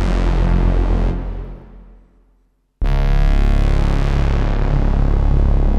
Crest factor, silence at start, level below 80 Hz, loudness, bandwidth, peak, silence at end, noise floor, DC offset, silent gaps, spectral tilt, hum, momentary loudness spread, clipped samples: 12 dB; 0 s; -16 dBFS; -19 LUFS; 6.4 kHz; -2 dBFS; 0 s; -59 dBFS; under 0.1%; none; -8 dB/octave; none; 9 LU; under 0.1%